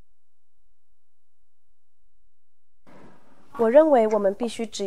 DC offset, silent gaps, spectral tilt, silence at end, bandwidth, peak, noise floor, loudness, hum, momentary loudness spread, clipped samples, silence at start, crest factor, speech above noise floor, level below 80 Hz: 1%; none; -5 dB/octave; 0 s; 11.5 kHz; -4 dBFS; -80 dBFS; -20 LUFS; none; 13 LU; under 0.1%; 3.55 s; 22 dB; 60 dB; -66 dBFS